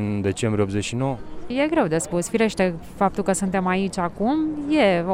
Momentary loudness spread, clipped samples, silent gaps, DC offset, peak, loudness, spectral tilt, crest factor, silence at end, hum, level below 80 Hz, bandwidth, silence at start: 6 LU; under 0.1%; none; under 0.1%; -6 dBFS; -23 LUFS; -5.5 dB/octave; 16 dB; 0 s; none; -46 dBFS; 16 kHz; 0 s